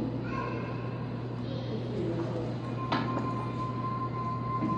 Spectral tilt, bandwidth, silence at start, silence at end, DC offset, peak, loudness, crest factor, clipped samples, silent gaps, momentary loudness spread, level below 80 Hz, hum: -8 dB/octave; 7.4 kHz; 0 s; 0 s; under 0.1%; -16 dBFS; -34 LUFS; 16 dB; under 0.1%; none; 4 LU; -54 dBFS; none